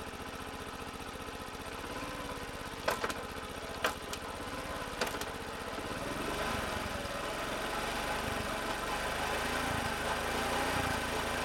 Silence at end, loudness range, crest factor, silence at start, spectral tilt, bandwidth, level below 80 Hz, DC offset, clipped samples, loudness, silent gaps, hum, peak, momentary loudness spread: 0 s; 5 LU; 22 dB; 0 s; -3.5 dB/octave; 19 kHz; -50 dBFS; under 0.1%; under 0.1%; -36 LUFS; none; none; -14 dBFS; 9 LU